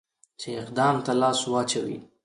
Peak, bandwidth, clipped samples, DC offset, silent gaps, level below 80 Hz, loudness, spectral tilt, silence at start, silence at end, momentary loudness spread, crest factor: -10 dBFS; 11.5 kHz; under 0.1%; under 0.1%; none; -68 dBFS; -25 LUFS; -4 dB/octave; 0.4 s; 0.2 s; 12 LU; 16 dB